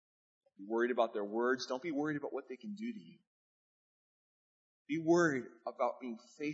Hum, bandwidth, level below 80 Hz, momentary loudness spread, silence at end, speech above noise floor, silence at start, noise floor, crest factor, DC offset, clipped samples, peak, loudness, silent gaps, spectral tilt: none; 7.6 kHz; -90 dBFS; 16 LU; 0 s; over 54 dB; 0.6 s; under -90 dBFS; 20 dB; under 0.1%; under 0.1%; -18 dBFS; -36 LUFS; 3.27-4.85 s; -4.5 dB/octave